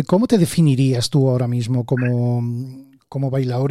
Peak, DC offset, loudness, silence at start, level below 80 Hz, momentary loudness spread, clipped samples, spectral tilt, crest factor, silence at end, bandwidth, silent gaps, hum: -4 dBFS; under 0.1%; -18 LUFS; 0 s; -54 dBFS; 10 LU; under 0.1%; -7 dB/octave; 14 dB; 0 s; 13.5 kHz; none; none